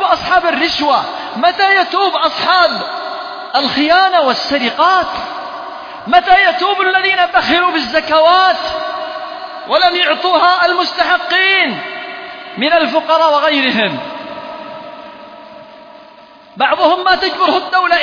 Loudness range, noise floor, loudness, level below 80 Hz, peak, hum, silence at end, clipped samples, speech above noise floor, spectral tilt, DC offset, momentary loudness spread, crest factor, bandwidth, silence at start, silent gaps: 5 LU; -40 dBFS; -12 LUFS; -50 dBFS; 0 dBFS; none; 0 s; under 0.1%; 28 dB; -3.5 dB/octave; under 0.1%; 16 LU; 14 dB; 5.4 kHz; 0 s; none